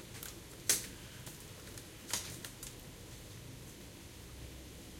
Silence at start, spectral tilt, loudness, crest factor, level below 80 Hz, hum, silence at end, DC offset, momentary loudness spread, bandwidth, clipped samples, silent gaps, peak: 0 s; -1.5 dB/octave; -42 LUFS; 30 dB; -58 dBFS; none; 0 s; under 0.1%; 18 LU; 16.5 kHz; under 0.1%; none; -14 dBFS